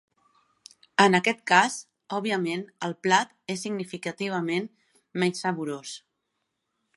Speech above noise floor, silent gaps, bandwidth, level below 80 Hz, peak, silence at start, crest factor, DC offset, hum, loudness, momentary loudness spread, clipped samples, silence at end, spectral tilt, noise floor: 54 dB; none; 11.5 kHz; -78 dBFS; -2 dBFS; 1 s; 26 dB; under 0.1%; none; -26 LUFS; 15 LU; under 0.1%; 1 s; -4 dB/octave; -80 dBFS